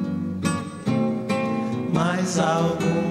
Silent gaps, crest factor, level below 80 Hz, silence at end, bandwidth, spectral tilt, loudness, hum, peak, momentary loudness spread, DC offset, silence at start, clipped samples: none; 16 dB; -56 dBFS; 0 s; 13.5 kHz; -6 dB/octave; -24 LUFS; none; -8 dBFS; 5 LU; under 0.1%; 0 s; under 0.1%